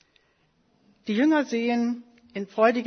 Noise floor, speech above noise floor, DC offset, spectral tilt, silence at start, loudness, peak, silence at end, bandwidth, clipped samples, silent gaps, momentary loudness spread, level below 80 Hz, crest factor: -67 dBFS; 43 dB; under 0.1%; -5.5 dB/octave; 1.05 s; -25 LUFS; -6 dBFS; 0 s; 6.6 kHz; under 0.1%; none; 15 LU; -76 dBFS; 20 dB